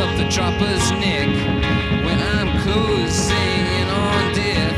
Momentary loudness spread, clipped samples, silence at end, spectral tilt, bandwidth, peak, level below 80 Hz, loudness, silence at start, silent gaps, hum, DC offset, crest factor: 1 LU; under 0.1%; 0 s; -4.5 dB/octave; 13.5 kHz; -4 dBFS; -30 dBFS; -18 LUFS; 0 s; none; none; 0.2%; 14 dB